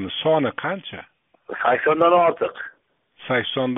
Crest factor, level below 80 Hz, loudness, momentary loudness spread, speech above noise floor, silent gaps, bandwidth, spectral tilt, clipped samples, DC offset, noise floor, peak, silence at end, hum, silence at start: 18 dB; -64 dBFS; -20 LUFS; 20 LU; 39 dB; none; 3.9 kHz; -3 dB/octave; under 0.1%; under 0.1%; -60 dBFS; -4 dBFS; 0 s; none; 0 s